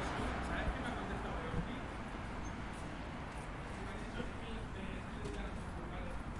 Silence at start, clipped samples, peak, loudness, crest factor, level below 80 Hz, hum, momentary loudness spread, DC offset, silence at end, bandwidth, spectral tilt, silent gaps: 0 s; under 0.1%; -26 dBFS; -43 LUFS; 16 dB; -48 dBFS; none; 6 LU; under 0.1%; 0 s; 11.5 kHz; -6 dB/octave; none